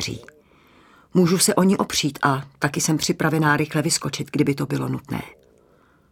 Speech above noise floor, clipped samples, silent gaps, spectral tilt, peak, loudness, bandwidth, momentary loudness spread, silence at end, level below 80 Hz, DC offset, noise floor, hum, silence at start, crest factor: 36 dB; under 0.1%; none; -4.5 dB/octave; -2 dBFS; -21 LUFS; 17.5 kHz; 12 LU; 0.85 s; -54 dBFS; under 0.1%; -57 dBFS; none; 0 s; 20 dB